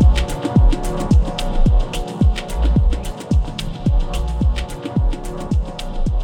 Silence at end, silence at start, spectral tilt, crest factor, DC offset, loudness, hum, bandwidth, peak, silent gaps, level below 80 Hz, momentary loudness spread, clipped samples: 0 s; 0 s; -6.5 dB/octave; 14 dB; under 0.1%; -20 LUFS; none; 13 kHz; -4 dBFS; none; -18 dBFS; 9 LU; under 0.1%